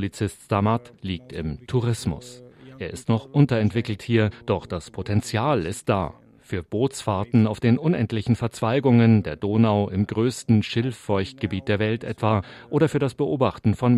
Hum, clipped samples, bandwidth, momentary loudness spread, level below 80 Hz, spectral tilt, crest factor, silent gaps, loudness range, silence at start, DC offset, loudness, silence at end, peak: none; under 0.1%; 12.5 kHz; 12 LU; -52 dBFS; -7 dB/octave; 18 dB; none; 5 LU; 0 s; under 0.1%; -23 LUFS; 0 s; -6 dBFS